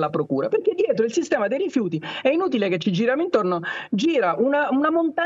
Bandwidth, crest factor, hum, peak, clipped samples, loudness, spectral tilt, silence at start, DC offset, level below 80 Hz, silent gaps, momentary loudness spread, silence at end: 7.8 kHz; 14 dB; none; -6 dBFS; under 0.1%; -22 LUFS; -6 dB/octave; 0 s; under 0.1%; -72 dBFS; none; 4 LU; 0 s